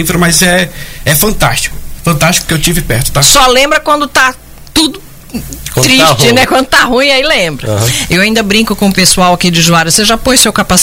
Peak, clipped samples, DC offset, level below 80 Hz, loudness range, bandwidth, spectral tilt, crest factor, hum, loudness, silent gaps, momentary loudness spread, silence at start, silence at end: 0 dBFS; 0.3%; under 0.1%; -24 dBFS; 1 LU; 17 kHz; -3 dB/octave; 8 dB; none; -7 LUFS; none; 9 LU; 0 s; 0 s